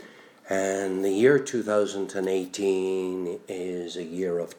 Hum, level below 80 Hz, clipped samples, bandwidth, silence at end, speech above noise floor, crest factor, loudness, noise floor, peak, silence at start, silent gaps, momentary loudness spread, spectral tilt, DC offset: none; -76 dBFS; under 0.1%; 18.5 kHz; 0.05 s; 23 dB; 20 dB; -26 LUFS; -48 dBFS; -8 dBFS; 0 s; none; 12 LU; -5 dB/octave; under 0.1%